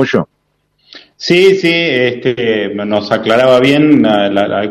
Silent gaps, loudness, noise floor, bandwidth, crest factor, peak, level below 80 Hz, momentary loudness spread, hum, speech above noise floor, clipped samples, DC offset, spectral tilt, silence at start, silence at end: none; -11 LUFS; -62 dBFS; 12.5 kHz; 12 dB; 0 dBFS; -52 dBFS; 8 LU; none; 51 dB; under 0.1%; under 0.1%; -6 dB/octave; 0 s; 0 s